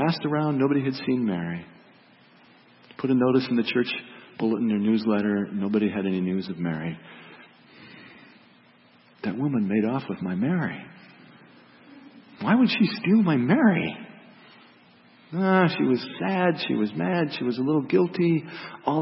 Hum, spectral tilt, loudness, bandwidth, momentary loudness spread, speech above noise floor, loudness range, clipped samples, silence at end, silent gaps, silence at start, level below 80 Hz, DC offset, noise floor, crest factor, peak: none; -11 dB/octave; -24 LUFS; 5.8 kHz; 14 LU; 33 dB; 7 LU; under 0.1%; 0 s; none; 0 s; -70 dBFS; under 0.1%; -56 dBFS; 18 dB; -6 dBFS